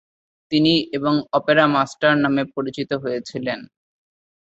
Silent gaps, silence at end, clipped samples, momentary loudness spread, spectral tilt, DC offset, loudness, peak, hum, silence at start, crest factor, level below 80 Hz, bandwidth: none; 0.85 s; under 0.1%; 11 LU; -6 dB/octave; under 0.1%; -20 LUFS; -2 dBFS; none; 0.5 s; 18 dB; -60 dBFS; 8 kHz